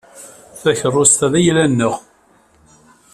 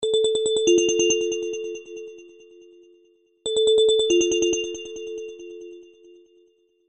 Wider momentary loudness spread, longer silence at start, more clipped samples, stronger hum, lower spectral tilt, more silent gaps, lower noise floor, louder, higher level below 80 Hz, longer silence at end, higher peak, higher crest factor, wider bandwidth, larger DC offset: second, 12 LU vs 21 LU; first, 0.15 s vs 0 s; neither; neither; first, -4 dB/octave vs -1.5 dB/octave; neither; second, -53 dBFS vs -61 dBFS; first, -14 LUFS vs -21 LUFS; first, -52 dBFS vs -60 dBFS; about the same, 1.15 s vs 1.05 s; first, 0 dBFS vs -6 dBFS; about the same, 18 dB vs 18 dB; first, 14 kHz vs 8.6 kHz; neither